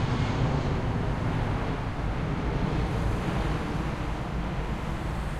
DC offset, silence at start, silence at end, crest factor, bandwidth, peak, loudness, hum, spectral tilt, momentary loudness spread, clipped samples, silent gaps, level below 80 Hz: under 0.1%; 0 s; 0 s; 14 dB; 12.5 kHz; -14 dBFS; -30 LUFS; none; -7 dB/octave; 5 LU; under 0.1%; none; -34 dBFS